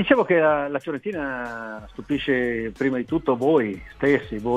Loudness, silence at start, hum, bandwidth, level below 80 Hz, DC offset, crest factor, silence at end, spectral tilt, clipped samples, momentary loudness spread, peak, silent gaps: -23 LUFS; 0 s; none; 10.5 kHz; -48 dBFS; under 0.1%; 20 dB; 0 s; -7 dB/octave; under 0.1%; 12 LU; -2 dBFS; none